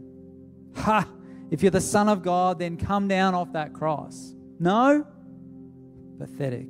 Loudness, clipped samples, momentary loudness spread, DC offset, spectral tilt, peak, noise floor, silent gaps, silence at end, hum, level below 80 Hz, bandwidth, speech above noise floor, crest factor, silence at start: -24 LUFS; under 0.1%; 22 LU; under 0.1%; -5.5 dB/octave; -8 dBFS; -46 dBFS; none; 0 s; none; -52 dBFS; 15.5 kHz; 23 dB; 18 dB; 0 s